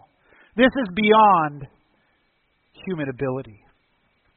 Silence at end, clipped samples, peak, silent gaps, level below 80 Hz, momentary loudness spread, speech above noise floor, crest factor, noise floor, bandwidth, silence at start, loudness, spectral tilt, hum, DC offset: 0.85 s; under 0.1%; -2 dBFS; none; -54 dBFS; 18 LU; 48 dB; 20 dB; -67 dBFS; 4.3 kHz; 0.55 s; -19 LUFS; -3.5 dB/octave; none; under 0.1%